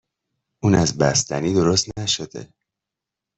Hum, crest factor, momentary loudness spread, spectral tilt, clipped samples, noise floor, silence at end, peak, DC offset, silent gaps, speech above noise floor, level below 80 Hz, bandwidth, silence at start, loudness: none; 18 dB; 7 LU; -4 dB/octave; under 0.1%; -86 dBFS; 0.95 s; -4 dBFS; under 0.1%; none; 66 dB; -48 dBFS; 8.4 kHz; 0.65 s; -20 LUFS